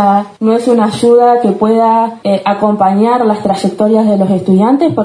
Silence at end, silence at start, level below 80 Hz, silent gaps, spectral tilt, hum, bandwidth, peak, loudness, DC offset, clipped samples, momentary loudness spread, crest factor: 0 s; 0 s; -54 dBFS; none; -7.5 dB/octave; none; 10.5 kHz; 0 dBFS; -10 LUFS; under 0.1%; under 0.1%; 5 LU; 10 dB